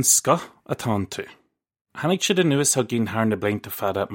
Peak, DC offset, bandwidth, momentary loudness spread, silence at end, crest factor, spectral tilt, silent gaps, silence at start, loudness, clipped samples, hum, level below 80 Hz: -4 dBFS; under 0.1%; 16.5 kHz; 14 LU; 0 s; 18 dB; -3.5 dB/octave; 1.81-1.85 s; 0 s; -22 LUFS; under 0.1%; none; -62 dBFS